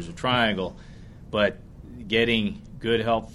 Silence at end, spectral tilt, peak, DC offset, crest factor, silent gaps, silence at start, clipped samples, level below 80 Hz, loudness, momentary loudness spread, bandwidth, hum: 0 s; -5.5 dB/octave; -6 dBFS; under 0.1%; 20 dB; none; 0 s; under 0.1%; -46 dBFS; -25 LUFS; 21 LU; 12 kHz; none